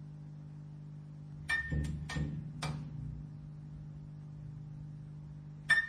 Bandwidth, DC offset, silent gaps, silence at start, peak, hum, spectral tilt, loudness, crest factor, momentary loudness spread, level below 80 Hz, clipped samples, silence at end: 13.5 kHz; under 0.1%; none; 0 s; -16 dBFS; 50 Hz at -45 dBFS; -5 dB/octave; -41 LUFS; 24 dB; 14 LU; -50 dBFS; under 0.1%; 0 s